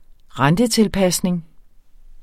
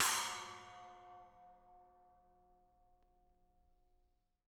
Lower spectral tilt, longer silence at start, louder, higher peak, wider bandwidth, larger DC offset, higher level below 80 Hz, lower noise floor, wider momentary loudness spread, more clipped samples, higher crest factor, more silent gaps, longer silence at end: first, -5 dB/octave vs 1 dB/octave; first, 0.35 s vs 0 s; first, -18 LUFS vs -40 LUFS; first, -2 dBFS vs -22 dBFS; second, 16.5 kHz vs over 20 kHz; neither; first, -42 dBFS vs -76 dBFS; second, -45 dBFS vs -78 dBFS; second, 10 LU vs 26 LU; neither; second, 18 dB vs 26 dB; neither; second, 0.1 s vs 2.7 s